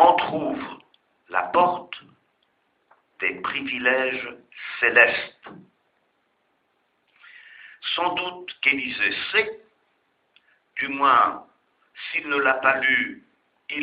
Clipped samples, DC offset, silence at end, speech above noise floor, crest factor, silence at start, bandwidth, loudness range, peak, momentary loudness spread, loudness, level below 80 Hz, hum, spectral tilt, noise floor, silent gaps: under 0.1%; under 0.1%; 0 s; 46 dB; 24 dB; 0 s; 5.2 kHz; 5 LU; 0 dBFS; 19 LU; -22 LUFS; -68 dBFS; none; -6.5 dB/octave; -70 dBFS; none